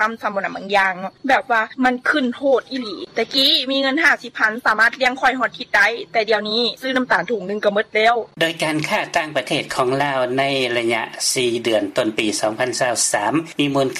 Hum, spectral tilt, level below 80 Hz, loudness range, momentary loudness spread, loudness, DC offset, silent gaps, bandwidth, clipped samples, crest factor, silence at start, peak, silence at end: none; -2.5 dB/octave; -58 dBFS; 3 LU; 6 LU; -18 LUFS; under 0.1%; none; 16 kHz; under 0.1%; 16 dB; 0 s; -2 dBFS; 0 s